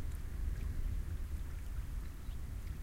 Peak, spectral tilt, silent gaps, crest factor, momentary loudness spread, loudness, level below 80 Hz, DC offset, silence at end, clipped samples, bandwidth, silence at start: -28 dBFS; -6 dB/octave; none; 12 dB; 4 LU; -44 LUFS; -40 dBFS; under 0.1%; 0 s; under 0.1%; 16 kHz; 0 s